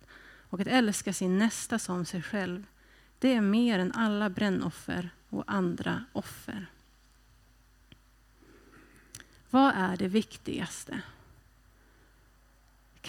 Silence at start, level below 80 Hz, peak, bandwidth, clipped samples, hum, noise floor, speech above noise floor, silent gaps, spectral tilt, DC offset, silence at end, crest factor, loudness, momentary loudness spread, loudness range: 0.1 s; -62 dBFS; -12 dBFS; 16 kHz; under 0.1%; none; -62 dBFS; 32 dB; none; -5 dB/octave; under 0.1%; 0 s; 20 dB; -30 LUFS; 16 LU; 8 LU